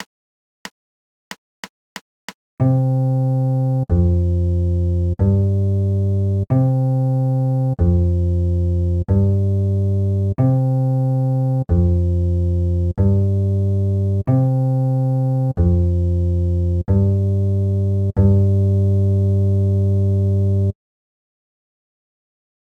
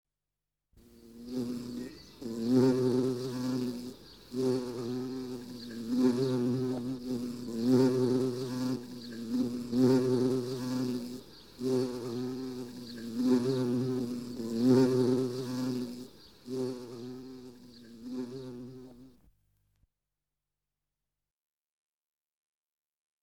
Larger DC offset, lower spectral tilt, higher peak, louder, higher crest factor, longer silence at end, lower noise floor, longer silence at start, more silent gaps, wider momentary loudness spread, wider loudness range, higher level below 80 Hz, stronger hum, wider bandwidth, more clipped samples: neither; first, -10.5 dB/octave vs -7 dB/octave; first, -2 dBFS vs -14 dBFS; first, -18 LUFS vs -32 LUFS; about the same, 14 dB vs 18 dB; second, 2.05 s vs 4.15 s; about the same, under -90 dBFS vs -90 dBFS; second, 0 s vs 0.95 s; first, 0.06-0.65 s, 0.71-1.31 s, 1.38-1.63 s, 1.70-2.28 s, 2.35-2.57 s vs none; second, 4 LU vs 19 LU; second, 3 LU vs 13 LU; first, -32 dBFS vs -68 dBFS; neither; second, 5 kHz vs 16.5 kHz; neither